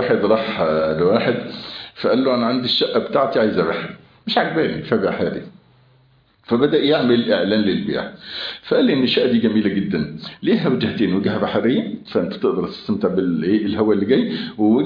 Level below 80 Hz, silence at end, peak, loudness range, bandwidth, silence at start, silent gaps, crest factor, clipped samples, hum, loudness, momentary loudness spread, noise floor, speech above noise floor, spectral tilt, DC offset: -54 dBFS; 0 s; -2 dBFS; 2 LU; 5.2 kHz; 0 s; none; 16 dB; under 0.1%; none; -19 LUFS; 9 LU; -56 dBFS; 37 dB; -8.5 dB/octave; under 0.1%